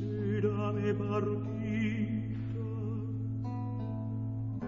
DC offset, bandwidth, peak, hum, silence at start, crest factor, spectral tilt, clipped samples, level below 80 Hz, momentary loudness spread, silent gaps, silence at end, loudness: 0.1%; 6.8 kHz; -18 dBFS; none; 0 s; 16 dB; -8.5 dB/octave; under 0.1%; -56 dBFS; 5 LU; none; 0 s; -35 LUFS